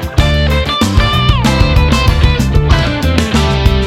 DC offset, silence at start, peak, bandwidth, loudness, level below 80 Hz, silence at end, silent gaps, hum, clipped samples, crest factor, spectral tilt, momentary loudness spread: under 0.1%; 0 s; 0 dBFS; 15.5 kHz; -11 LUFS; -14 dBFS; 0 s; none; none; 2%; 10 dB; -5.5 dB/octave; 2 LU